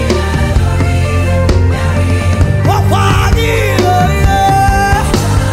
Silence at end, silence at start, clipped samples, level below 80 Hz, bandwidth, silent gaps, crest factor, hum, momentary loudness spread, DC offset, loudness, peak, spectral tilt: 0 s; 0 s; under 0.1%; -18 dBFS; 16 kHz; none; 10 dB; none; 3 LU; under 0.1%; -11 LUFS; 0 dBFS; -6 dB/octave